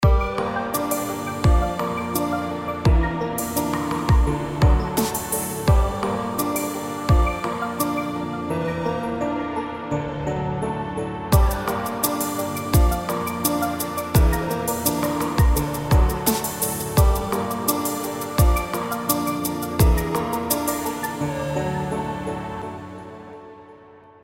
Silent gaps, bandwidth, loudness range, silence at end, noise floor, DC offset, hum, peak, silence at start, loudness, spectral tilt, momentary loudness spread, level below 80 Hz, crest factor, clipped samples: none; 17 kHz; 4 LU; 0.25 s; -47 dBFS; under 0.1%; none; -4 dBFS; 0 s; -23 LUFS; -5.5 dB/octave; 8 LU; -26 dBFS; 18 dB; under 0.1%